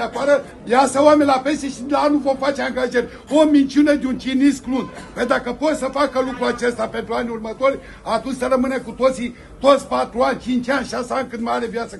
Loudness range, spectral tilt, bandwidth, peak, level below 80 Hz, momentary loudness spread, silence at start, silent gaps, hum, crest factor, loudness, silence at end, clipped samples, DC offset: 4 LU; -4.5 dB/octave; 12 kHz; 0 dBFS; -46 dBFS; 10 LU; 0 s; none; none; 18 dB; -19 LUFS; 0 s; under 0.1%; under 0.1%